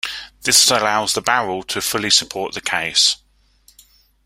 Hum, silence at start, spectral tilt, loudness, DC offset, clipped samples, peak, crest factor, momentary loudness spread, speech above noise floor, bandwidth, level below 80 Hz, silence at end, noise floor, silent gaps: none; 0.05 s; -0.5 dB/octave; -16 LUFS; under 0.1%; under 0.1%; 0 dBFS; 20 dB; 12 LU; 37 dB; 16 kHz; -54 dBFS; 1.1 s; -54 dBFS; none